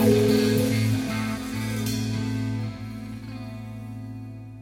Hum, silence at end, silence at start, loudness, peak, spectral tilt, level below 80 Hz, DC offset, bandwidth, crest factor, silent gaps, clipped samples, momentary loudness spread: none; 0 s; 0 s; -26 LUFS; -6 dBFS; -6 dB/octave; -48 dBFS; under 0.1%; 17 kHz; 20 dB; none; under 0.1%; 16 LU